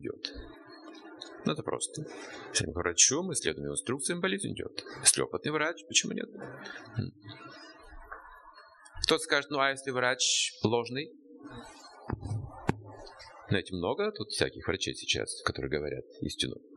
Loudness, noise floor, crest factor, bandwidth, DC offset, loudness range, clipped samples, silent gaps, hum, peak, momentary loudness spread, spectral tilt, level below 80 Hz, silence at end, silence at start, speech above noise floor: -30 LUFS; -54 dBFS; 26 dB; 12 kHz; under 0.1%; 8 LU; under 0.1%; none; none; -8 dBFS; 23 LU; -2.5 dB/octave; -56 dBFS; 0 s; 0 s; 22 dB